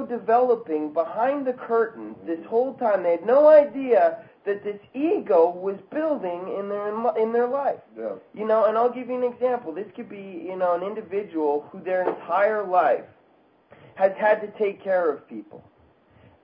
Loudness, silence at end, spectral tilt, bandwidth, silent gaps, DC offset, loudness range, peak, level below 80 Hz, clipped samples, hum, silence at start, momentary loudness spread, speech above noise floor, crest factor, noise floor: -23 LUFS; 0.85 s; -10 dB/octave; 5.2 kHz; none; under 0.1%; 6 LU; -4 dBFS; -74 dBFS; under 0.1%; none; 0 s; 13 LU; 37 dB; 18 dB; -59 dBFS